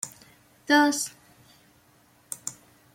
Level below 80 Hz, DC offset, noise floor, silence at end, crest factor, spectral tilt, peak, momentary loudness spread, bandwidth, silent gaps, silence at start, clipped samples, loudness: -74 dBFS; under 0.1%; -60 dBFS; 0.45 s; 22 dB; -1.5 dB/octave; -8 dBFS; 19 LU; 16.5 kHz; none; 0.05 s; under 0.1%; -25 LUFS